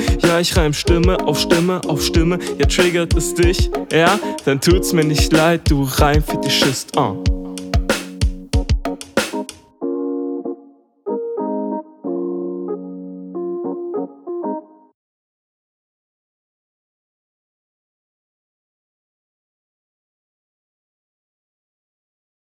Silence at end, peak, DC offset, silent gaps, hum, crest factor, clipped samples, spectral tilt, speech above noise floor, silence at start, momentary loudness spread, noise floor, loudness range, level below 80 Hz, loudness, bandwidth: 7.85 s; 0 dBFS; under 0.1%; none; none; 20 dB; under 0.1%; -5 dB/octave; 31 dB; 0 s; 13 LU; -47 dBFS; 13 LU; -26 dBFS; -18 LUFS; 19 kHz